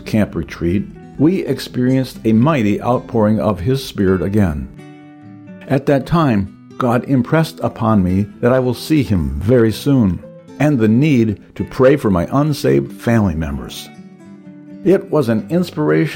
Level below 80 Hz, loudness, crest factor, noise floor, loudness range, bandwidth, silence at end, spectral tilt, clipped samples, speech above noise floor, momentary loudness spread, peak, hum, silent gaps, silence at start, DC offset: -36 dBFS; -16 LUFS; 12 dB; -38 dBFS; 3 LU; 17 kHz; 0 s; -7.5 dB/octave; under 0.1%; 23 dB; 9 LU; -2 dBFS; none; none; 0 s; under 0.1%